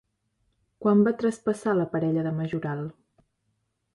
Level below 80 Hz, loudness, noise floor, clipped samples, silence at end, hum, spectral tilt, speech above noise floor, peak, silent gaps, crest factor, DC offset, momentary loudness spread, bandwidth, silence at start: -66 dBFS; -26 LUFS; -75 dBFS; under 0.1%; 1.05 s; none; -8 dB/octave; 51 dB; -10 dBFS; none; 18 dB; under 0.1%; 11 LU; 11.5 kHz; 0.8 s